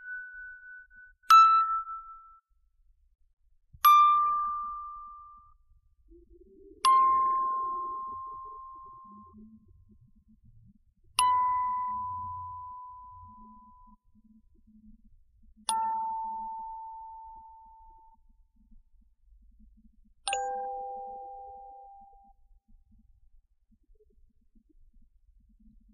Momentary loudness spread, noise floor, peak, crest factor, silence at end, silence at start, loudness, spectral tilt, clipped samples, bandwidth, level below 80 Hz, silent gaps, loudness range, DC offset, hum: 28 LU; -67 dBFS; -8 dBFS; 24 dB; 4.05 s; 0 s; -26 LUFS; 1 dB/octave; under 0.1%; 7 kHz; -62 dBFS; 3.33-3.37 s; 19 LU; under 0.1%; none